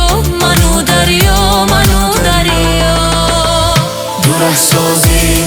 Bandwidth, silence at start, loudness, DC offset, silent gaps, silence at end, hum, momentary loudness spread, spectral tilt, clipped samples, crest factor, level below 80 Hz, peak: over 20 kHz; 0 s; -9 LUFS; under 0.1%; none; 0 s; none; 3 LU; -3.5 dB/octave; under 0.1%; 10 dB; -16 dBFS; 0 dBFS